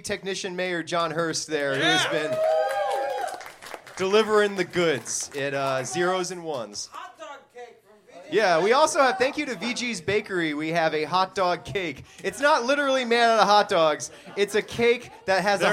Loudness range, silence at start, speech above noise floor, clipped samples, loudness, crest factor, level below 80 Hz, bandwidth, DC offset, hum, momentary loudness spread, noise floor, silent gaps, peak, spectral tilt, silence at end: 5 LU; 0.05 s; 28 dB; under 0.1%; -24 LUFS; 22 dB; -64 dBFS; 16 kHz; under 0.1%; none; 13 LU; -52 dBFS; none; -2 dBFS; -3 dB/octave; 0 s